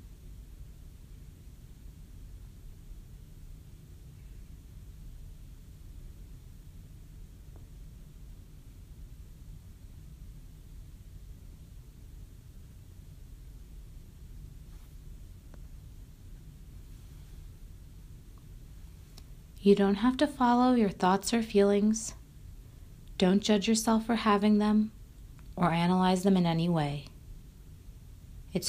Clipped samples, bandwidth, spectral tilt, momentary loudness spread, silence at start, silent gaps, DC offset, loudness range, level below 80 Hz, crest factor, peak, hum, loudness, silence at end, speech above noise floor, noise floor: under 0.1%; 15.5 kHz; -5.5 dB/octave; 26 LU; 0.05 s; none; under 0.1%; 24 LU; -50 dBFS; 22 dB; -10 dBFS; none; -27 LUFS; 0 s; 24 dB; -50 dBFS